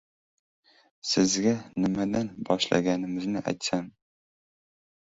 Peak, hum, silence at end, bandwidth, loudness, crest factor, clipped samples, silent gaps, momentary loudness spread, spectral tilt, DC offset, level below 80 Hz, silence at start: -6 dBFS; none; 1.15 s; 8 kHz; -27 LUFS; 22 dB; under 0.1%; none; 7 LU; -4.5 dB/octave; under 0.1%; -60 dBFS; 1.05 s